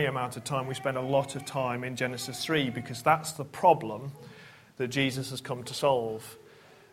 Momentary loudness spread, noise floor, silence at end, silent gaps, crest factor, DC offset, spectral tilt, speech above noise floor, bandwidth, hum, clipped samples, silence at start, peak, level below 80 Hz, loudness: 12 LU; -55 dBFS; 0.5 s; none; 22 dB; under 0.1%; -4.5 dB/octave; 25 dB; 16 kHz; none; under 0.1%; 0 s; -8 dBFS; -66 dBFS; -30 LUFS